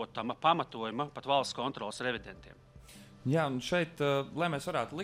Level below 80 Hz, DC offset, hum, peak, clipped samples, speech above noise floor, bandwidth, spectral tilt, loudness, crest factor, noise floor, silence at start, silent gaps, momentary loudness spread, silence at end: -64 dBFS; under 0.1%; none; -12 dBFS; under 0.1%; 21 dB; 16 kHz; -5 dB/octave; -33 LUFS; 22 dB; -54 dBFS; 0 s; none; 11 LU; 0 s